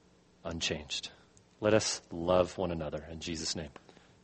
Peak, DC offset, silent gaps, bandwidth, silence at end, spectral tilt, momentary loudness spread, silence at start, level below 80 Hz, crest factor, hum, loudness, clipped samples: -12 dBFS; under 0.1%; none; 8.8 kHz; 0.55 s; -4 dB/octave; 13 LU; 0.45 s; -56 dBFS; 22 dB; none; -33 LUFS; under 0.1%